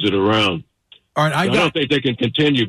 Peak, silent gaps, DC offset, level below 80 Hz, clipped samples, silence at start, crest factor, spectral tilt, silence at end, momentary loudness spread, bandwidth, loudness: -6 dBFS; none; under 0.1%; -52 dBFS; under 0.1%; 0 s; 12 dB; -5.5 dB/octave; 0 s; 4 LU; 13.5 kHz; -17 LUFS